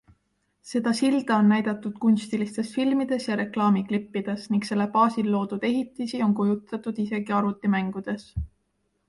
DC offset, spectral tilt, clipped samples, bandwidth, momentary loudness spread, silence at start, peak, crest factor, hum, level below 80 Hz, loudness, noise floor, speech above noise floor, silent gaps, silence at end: under 0.1%; -6.5 dB/octave; under 0.1%; 11.5 kHz; 9 LU; 0.65 s; -8 dBFS; 18 dB; none; -50 dBFS; -25 LUFS; -73 dBFS; 49 dB; none; 0.6 s